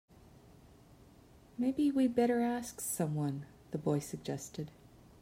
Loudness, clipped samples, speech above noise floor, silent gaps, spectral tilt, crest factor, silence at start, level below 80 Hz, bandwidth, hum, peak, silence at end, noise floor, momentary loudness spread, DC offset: -35 LUFS; under 0.1%; 26 dB; none; -6 dB/octave; 18 dB; 1.6 s; -66 dBFS; 16 kHz; none; -18 dBFS; 0.55 s; -60 dBFS; 15 LU; under 0.1%